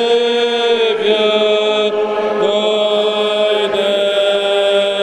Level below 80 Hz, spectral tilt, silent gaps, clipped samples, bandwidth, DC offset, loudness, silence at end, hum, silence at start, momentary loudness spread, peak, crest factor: -62 dBFS; -3.5 dB/octave; none; under 0.1%; 12 kHz; under 0.1%; -14 LUFS; 0 s; none; 0 s; 2 LU; -2 dBFS; 12 dB